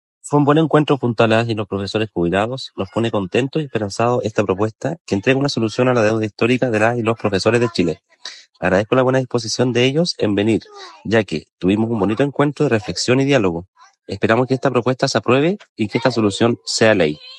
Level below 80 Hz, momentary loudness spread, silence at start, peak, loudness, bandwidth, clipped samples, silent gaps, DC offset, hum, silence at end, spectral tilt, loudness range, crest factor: -54 dBFS; 8 LU; 0.25 s; 0 dBFS; -18 LUFS; 11.5 kHz; under 0.1%; 5.00-5.05 s, 11.52-11.58 s, 13.68-13.73 s, 15.69-15.76 s; under 0.1%; none; 0 s; -5.5 dB/octave; 2 LU; 18 dB